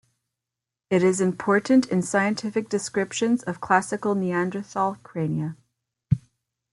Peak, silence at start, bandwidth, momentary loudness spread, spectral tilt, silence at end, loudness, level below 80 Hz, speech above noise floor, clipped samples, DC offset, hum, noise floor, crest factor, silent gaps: -4 dBFS; 0.9 s; 11.5 kHz; 7 LU; -5.5 dB/octave; 0.55 s; -24 LUFS; -58 dBFS; 64 dB; under 0.1%; under 0.1%; none; -87 dBFS; 20 dB; none